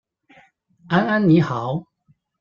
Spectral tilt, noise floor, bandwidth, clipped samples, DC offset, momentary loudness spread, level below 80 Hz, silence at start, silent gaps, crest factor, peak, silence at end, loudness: -8.5 dB/octave; -62 dBFS; 7 kHz; under 0.1%; under 0.1%; 11 LU; -60 dBFS; 0.9 s; none; 18 dB; -4 dBFS; 0.6 s; -19 LUFS